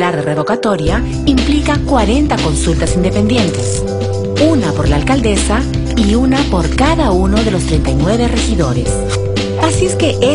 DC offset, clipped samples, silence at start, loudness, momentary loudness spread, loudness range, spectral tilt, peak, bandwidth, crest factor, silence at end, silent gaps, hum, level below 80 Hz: under 0.1%; under 0.1%; 0 s; -13 LUFS; 4 LU; 1 LU; -5.5 dB/octave; 0 dBFS; 11 kHz; 12 dB; 0 s; none; none; -20 dBFS